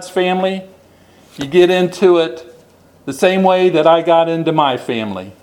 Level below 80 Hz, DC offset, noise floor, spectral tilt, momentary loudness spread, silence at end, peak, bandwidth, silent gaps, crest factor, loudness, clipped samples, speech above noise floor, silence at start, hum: -60 dBFS; under 0.1%; -47 dBFS; -6 dB/octave; 15 LU; 0.1 s; 0 dBFS; 13.5 kHz; none; 14 dB; -14 LUFS; under 0.1%; 33 dB; 0 s; none